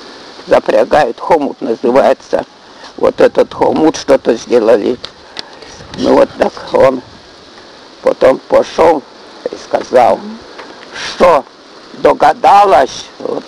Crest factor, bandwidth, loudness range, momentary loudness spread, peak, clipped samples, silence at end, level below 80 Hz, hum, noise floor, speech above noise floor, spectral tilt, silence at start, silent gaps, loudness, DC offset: 12 dB; 11.5 kHz; 2 LU; 19 LU; 0 dBFS; under 0.1%; 0 s; -44 dBFS; none; -36 dBFS; 26 dB; -5 dB/octave; 0 s; none; -11 LUFS; under 0.1%